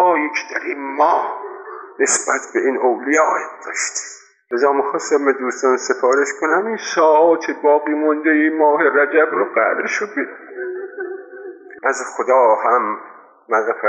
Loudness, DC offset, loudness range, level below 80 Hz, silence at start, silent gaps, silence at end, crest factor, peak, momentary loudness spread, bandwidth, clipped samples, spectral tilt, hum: -17 LUFS; under 0.1%; 5 LU; -82 dBFS; 0 s; none; 0 s; 14 dB; -4 dBFS; 15 LU; 10 kHz; under 0.1%; -2 dB/octave; none